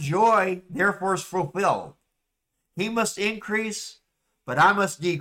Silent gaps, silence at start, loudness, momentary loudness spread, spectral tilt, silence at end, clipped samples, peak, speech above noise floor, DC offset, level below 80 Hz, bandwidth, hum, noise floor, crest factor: none; 0 s; -24 LUFS; 15 LU; -4.5 dB/octave; 0 s; under 0.1%; -10 dBFS; 55 dB; under 0.1%; -62 dBFS; 16.5 kHz; none; -79 dBFS; 16 dB